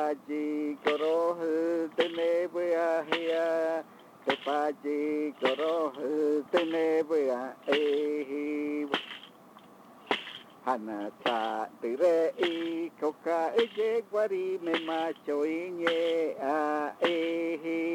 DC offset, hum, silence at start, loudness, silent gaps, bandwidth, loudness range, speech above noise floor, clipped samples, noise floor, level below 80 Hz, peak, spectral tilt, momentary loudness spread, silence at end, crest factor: under 0.1%; none; 0 s; -30 LUFS; none; 16 kHz; 4 LU; 24 dB; under 0.1%; -54 dBFS; -86 dBFS; -12 dBFS; -4.5 dB/octave; 6 LU; 0 s; 18 dB